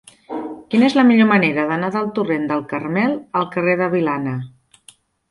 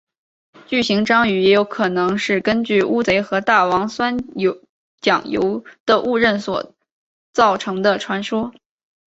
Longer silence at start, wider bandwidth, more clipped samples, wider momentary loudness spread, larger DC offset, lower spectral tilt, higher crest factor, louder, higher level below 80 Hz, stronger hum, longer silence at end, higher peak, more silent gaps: second, 0.3 s vs 0.7 s; first, 11.5 kHz vs 8 kHz; neither; first, 16 LU vs 9 LU; neither; first, -7 dB/octave vs -5 dB/octave; about the same, 16 dB vs 18 dB; about the same, -18 LUFS vs -18 LUFS; second, -60 dBFS vs -54 dBFS; neither; first, 0.85 s vs 0.6 s; about the same, -2 dBFS vs 0 dBFS; second, none vs 4.69-4.98 s, 5.80-5.86 s, 6.92-7.33 s